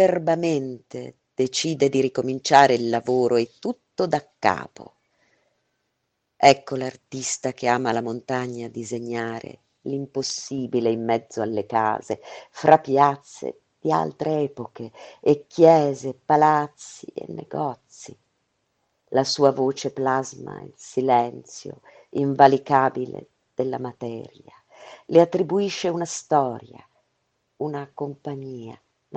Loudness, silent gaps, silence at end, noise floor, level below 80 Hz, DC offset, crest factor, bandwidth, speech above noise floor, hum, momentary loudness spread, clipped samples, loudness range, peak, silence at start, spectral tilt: -22 LUFS; none; 0 s; -76 dBFS; -68 dBFS; under 0.1%; 24 dB; 9.2 kHz; 54 dB; none; 20 LU; under 0.1%; 6 LU; 0 dBFS; 0 s; -5 dB/octave